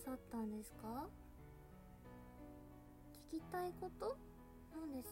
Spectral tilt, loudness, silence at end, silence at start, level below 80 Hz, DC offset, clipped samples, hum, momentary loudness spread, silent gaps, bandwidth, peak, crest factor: -6 dB/octave; -51 LUFS; 0 s; 0 s; -64 dBFS; under 0.1%; under 0.1%; none; 14 LU; none; 16 kHz; -36 dBFS; 16 dB